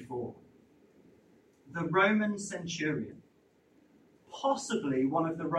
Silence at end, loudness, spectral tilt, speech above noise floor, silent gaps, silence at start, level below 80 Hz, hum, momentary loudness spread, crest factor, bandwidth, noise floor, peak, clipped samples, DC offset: 0 s; -31 LUFS; -5 dB/octave; 36 dB; none; 0 s; -72 dBFS; none; 16 LU; 20 dB; 11 kHz; -66 dBFS; -14 dBFS; under 0.1%; under 0.1%